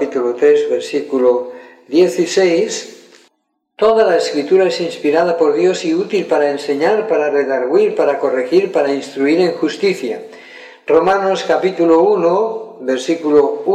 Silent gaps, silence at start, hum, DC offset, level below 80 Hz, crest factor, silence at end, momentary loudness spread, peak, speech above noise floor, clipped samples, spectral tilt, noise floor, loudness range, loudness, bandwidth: none; 0 s; none; under 0.1%; -62 dBFS; 14 dB; 0 s; 8 LU; 0 dBFS; 53 dB; under 0.1%; -5 dB/octave; -67 dBFS; 2 LU; -15 LUFS; 11.5 kHz